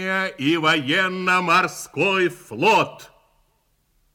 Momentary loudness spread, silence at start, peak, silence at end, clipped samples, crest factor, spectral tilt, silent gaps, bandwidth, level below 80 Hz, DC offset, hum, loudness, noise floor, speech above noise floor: 6 LU; 0 s; -6 dBFS; 1.1 s; under 0.1%; 16 dB; -4 dB/octave; none; 17.5 kHz; -62 dBFS; under 0.1%; none; -20 LUFS; -66 dBFS; 45 dB